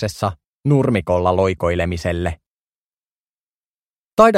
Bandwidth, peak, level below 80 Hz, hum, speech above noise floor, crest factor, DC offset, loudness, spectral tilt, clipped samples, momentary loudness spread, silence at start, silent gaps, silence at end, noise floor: 15 kHz; 0 dBFS; -40 dBFS; none; over 72 dB; 20 dB; under 0.1%; -19 LUFS; -7 dB/octave; under 0.1%; 9 LU; 0 s; 0.48-0.61 s, 2.46-2.91 s, 2.97-4.17 s; 0 s; under -90 dBFS